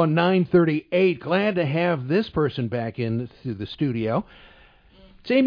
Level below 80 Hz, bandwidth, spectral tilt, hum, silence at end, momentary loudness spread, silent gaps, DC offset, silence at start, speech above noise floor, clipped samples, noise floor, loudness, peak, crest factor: -54 dBFS; 5.2 kHz; -9.5 dB/octave; none; 0 s; 10 LU; none; under 0.1%; 0 s; 30 dB; under 0.1%; -52 dBFS; -23 LUFS; -6 dBFS; 16 dB